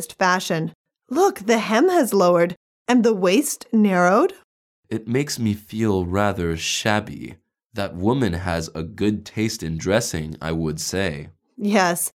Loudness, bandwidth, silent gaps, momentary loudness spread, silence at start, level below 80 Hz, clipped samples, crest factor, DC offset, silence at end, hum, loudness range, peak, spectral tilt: -21 LUFS; 17.5 kHz; 0.75-0.85 s, 2.57-2.85 s, 4.44-4.83 s; 12 LU; 0 s; -48 dBFS; under 0.1%; 18 dB; under 0.1%; 0.1 s; none; 6 LU; -4 dBFS; -5 dB/octave